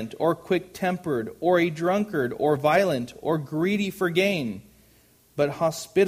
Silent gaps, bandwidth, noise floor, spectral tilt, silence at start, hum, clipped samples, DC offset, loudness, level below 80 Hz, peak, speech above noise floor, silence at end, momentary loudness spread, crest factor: none; 15.5 kHz; -58 dBFS; -6 dB/octave; 0 s; none; under 0.1%; under 0.1%; -25 LUFS; -62 dBFS; -8 dBFS; 34 dB; 0 s; 7 LU; 18 dB